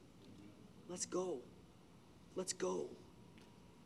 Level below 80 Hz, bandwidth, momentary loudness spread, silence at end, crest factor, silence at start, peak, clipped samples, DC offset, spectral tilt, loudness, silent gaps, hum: -76 dBFS; 13.5 kHz; 22 LU; 0 s; 20 dB; 0 s; -28 dBFS; under 0.1%; under 0.1%; -4 dB/octave; -44 LUFS; none; none